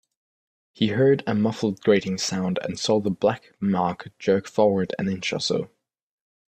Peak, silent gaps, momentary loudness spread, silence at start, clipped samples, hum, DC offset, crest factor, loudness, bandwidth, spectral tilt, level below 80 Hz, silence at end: -6 dBFS; none; 7 LU; 0.8 s; under 0.1%; none; under 0.1%; 18 dB; -24 LUFS; 9.2 kHz; -5.5 dB/octave; -62 dBFS; 0.85 s